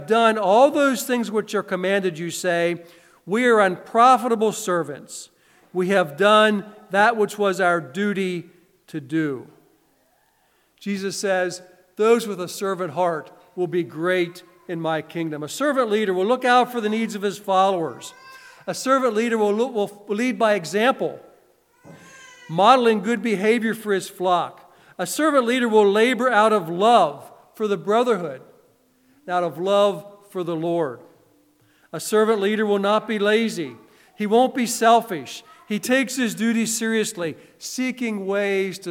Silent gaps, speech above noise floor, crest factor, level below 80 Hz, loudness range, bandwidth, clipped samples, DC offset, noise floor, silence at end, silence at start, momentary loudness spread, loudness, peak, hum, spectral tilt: none; 43 dB; 20 dB; -78 dBFS; 6 LU; 17 kHz; under 0.1%; under 0.1%; -63 dBFS; 0 s; 0 s; 14 LU; -21 LUFS; -2 dBFS; none; -4.5 dB/octave